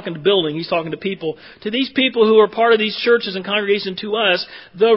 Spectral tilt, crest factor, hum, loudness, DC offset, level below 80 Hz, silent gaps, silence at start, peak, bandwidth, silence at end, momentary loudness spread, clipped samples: -9 dB/octave; 16 dB; none; -17 LUFS; under 0.1%; -62 dBFS; none; 0 s; 0 dBFS; 5.8 kHz; 0 s; 11 LU; under 0.1%